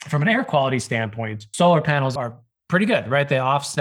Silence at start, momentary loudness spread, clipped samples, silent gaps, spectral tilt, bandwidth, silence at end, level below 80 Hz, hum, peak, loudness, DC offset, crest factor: 0 s; 11 LU; under 0.1%; none; -5.5 dB/octave; 13.5 kHz; 0 s; -62 dBFS; none; -4 dBFS; -20 LUFS; under 0.1%; 16 dB